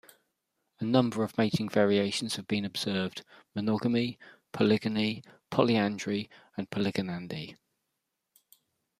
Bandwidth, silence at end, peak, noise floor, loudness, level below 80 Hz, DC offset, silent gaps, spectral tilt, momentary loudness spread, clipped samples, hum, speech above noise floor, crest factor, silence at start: 14.5 kHz; 1.45 s; -8 dBFS; -83 dBFS; -30 LUFS; -70 dBFS; under 0.1%; none; -5.5 dB/octave; 14 LU; under 0.1%; none; 54 dB; 24 dB; 0.8 s